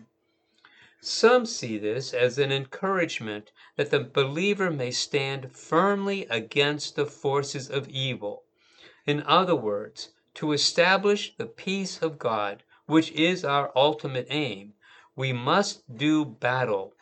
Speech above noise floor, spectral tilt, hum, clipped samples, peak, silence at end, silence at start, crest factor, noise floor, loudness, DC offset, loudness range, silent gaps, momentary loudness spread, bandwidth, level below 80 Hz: 45 dB; -4.5 dB/octave; none; under 0.1%; -6 dBFS; 0.15 s; 1.05 s; 20 dB; -71 dBFS; -26 LUFS; under 0.1%; 3 LU; none; 13 LU; 9 kHz; -78 dBFS